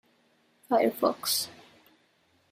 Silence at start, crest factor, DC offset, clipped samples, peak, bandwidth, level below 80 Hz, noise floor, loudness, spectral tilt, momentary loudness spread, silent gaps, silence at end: 0.7 s; 22 dB; under 0.1%; under 0.1%; -10 dBFS; 16 kHz; -76 dBFS; -68 dBFS; -28 LUFS; -2.5 dB/octave; 4 LU; none; 1 s